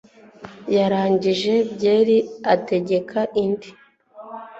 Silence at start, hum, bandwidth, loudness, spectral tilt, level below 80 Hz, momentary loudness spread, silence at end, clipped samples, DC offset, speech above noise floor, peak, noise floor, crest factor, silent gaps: 0.4 s; none; 8 kHz; -20 LUFS; -6.5 dB/octave; -62 dBFS; 10 LU; 0 s; under 0.1%; under 0.1%; 24 dB; -4 dBFS; -43 dBFS; 18 dB; none